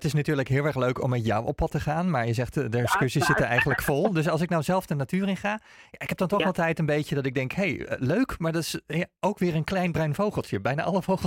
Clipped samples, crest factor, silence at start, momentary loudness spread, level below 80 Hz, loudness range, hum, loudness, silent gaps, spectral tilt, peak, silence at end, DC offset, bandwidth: under 0.1%; 16 dB; 0 s; 6 LU; -48 dBFS; 3 LU; none; -26 LUFS; none; -6 dB/octave; -10 dBFS; 0 s; under 0.1%; 16.5 kHz